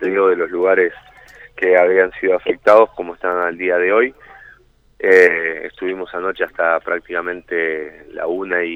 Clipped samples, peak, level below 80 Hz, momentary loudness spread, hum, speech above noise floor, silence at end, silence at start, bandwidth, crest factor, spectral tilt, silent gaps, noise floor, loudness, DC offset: under 0.1%; 0 dBFS; -54 dBFS; 12 LU; none; 34 dB; 0 s; 0 s; 7.6 kHz; 16 dB; -5.5 dB/octave; none; -50 dBFS; -16 LUFS; under 0.1%